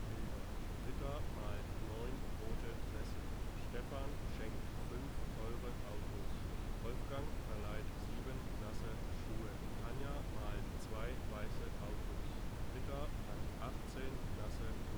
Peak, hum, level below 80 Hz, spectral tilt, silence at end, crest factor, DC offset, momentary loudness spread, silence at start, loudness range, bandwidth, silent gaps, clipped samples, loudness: -30 dBFS; none; -46 dBFS; -6 dB/octave; 0 s; 12 dB; under 0.1%; 2 LU; 0 s; 0 LU; over 20 kHz; none; under 0.1%; -47 LUFS